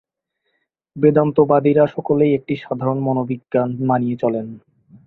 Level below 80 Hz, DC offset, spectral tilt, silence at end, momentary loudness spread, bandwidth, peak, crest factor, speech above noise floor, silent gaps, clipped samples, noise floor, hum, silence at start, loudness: -58 dBFS; under 0.1%; -11 dB/octave; 0.5 s; 8 LU; 4.2 kHz; -2 dBFS; 16 dB; 57 dB; none; under 0.1%; -74 dBFS; none; 0.95 s; -18 LUFS